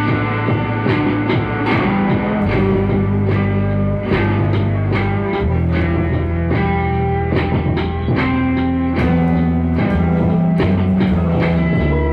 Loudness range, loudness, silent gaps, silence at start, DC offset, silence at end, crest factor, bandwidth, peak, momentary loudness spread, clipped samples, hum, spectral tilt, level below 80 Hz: 2 LU; -17 LUFS; none; 0 s; under 0.1%; 0 s; 14 dB; 5.4 kHz; -2 dBFS; 3 LU; under 0.1%; none; -10 dB/octave; -28 dBFS